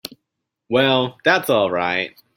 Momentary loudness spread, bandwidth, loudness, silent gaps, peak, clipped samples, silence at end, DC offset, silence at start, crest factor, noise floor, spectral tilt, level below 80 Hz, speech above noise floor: 6 LU; 16.5 kHz; -18 LUFS; none; -2 dBFS; under 0.1%; 0.3 s; under 0.1%; 0.05 s; 18 dB; -79 dBFS; -4.5 dB/octave; -62 dBFS; 61 dB